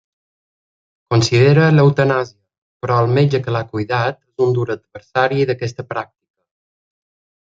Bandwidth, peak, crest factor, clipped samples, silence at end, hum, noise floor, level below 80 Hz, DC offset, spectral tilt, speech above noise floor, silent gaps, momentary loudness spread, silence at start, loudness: 7.8 kHz; -2 dBFS; 16 dB; under 0.1%; 1.4 s; none; under -90 dBFS; -56 dBFS; under 0.1%; -6.5 dB/octave; over 74 dB; 2.58-2.80 s; 15 LU; 1.1 s; -16 LUFS